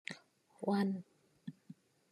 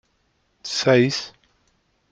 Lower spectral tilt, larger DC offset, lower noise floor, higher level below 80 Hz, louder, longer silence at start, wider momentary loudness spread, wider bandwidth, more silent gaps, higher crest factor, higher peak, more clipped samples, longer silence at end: first, -7 dB/octave vs -4.5 dB/octave; neither; second, -63 dBFS vs -67 dBFS; second, under -90 dBFS vs -64 dBFS; second, -38 LUFS vs -20 LUFS; second, 0.1 s vs 0.65 s; first, 24 LU vs 20 LU; first, 12.5 kHz vs 9.2 kHz; neither; about the same, 18 dB vs 20 dB; second, -24 dBFS vs -4 dBFS; neither; second, 0.4 s vs 0.8 s